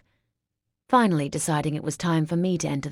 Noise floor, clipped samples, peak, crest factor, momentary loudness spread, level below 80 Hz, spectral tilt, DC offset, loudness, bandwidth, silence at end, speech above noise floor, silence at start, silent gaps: -83 dBFS; under 0.1%; -6 dBFS; 18 dB; 6 LU; -58 dBFS; -5.5 dB/octave; under 0.1%; -24 LUFS; 14 kHz; 0 s; 59 dB; 0.9 s; none